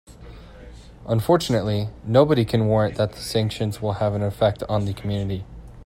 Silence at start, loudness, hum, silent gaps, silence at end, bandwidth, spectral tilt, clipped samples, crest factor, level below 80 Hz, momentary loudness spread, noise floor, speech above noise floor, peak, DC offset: 0.1 s; -22 LUFS; none; none; 0 s; 16 kHz; -7 dB/octave; under 0.1%; 20 dB; -44 dBFS; 8 LU; -42 dBFS; 21 dB; -2 dBFS; under 0.1%